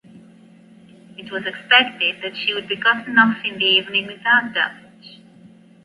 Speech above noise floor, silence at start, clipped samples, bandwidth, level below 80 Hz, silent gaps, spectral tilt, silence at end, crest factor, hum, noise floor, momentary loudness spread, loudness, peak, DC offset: 28 dB; 0.15 s; under 0.1%; 11.5 kHz; -68 dBFS; none; -4.5 dB/octave; 0.7 s; 22 dB; none; -47 dBFS; 13 LU; -17 LUFS; 0 dBFS; under 0.1%